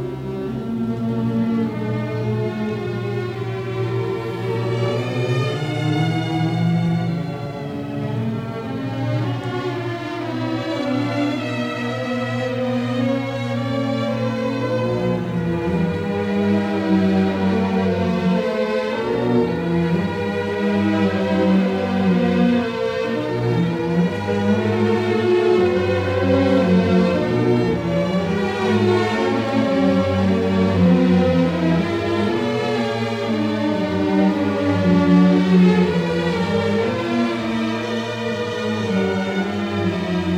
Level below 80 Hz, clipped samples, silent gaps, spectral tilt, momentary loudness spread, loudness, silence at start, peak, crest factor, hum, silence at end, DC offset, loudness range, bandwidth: -52 dBFS; under 0.1%; none; -7.5 dB/octave; 8 LU; -20 LUFS; 0 s; -4 dBFS; 16 dB; none; 0 s; under 0.1%; 6 LU; 9.8 kHz